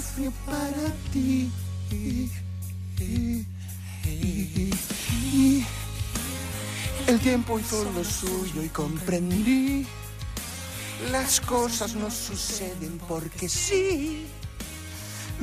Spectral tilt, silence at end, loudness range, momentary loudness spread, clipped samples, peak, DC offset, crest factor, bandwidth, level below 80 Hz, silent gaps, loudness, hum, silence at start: -4.5 dB/octave; 0 s; 4 LU; 13 LU; under 0.1%; -10 dBFS; under 0.1%; 18 dB; 15.5 kHz; -40 dBFS; none; -28 LUFS; none; 0 s